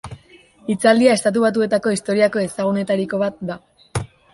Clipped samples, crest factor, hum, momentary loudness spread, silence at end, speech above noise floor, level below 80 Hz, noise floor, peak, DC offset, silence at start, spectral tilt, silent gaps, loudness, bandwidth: under 0.1%; 18 dB; none; 16 LU; 0.25 s; 31 dB; -50 dBFS; -49 dBFS; -2 dBFS; under 0.1%; 0.05 s; -5 dB/octave; none; -18 LUFS; 11.5 kHz